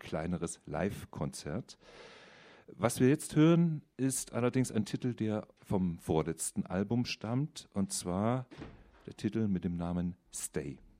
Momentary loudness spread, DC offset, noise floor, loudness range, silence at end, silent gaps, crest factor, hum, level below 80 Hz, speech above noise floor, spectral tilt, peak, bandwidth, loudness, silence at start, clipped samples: 14 LU; under 0.1%; -57 dBFS; 5 LU; 0.25 s; none; 20 dB; none; -60 dBFS; 24 dB; -6 dB/octave; -14 dBFS; 15.5 kHz; -34 LUFS; 0.05 s; under 0.1%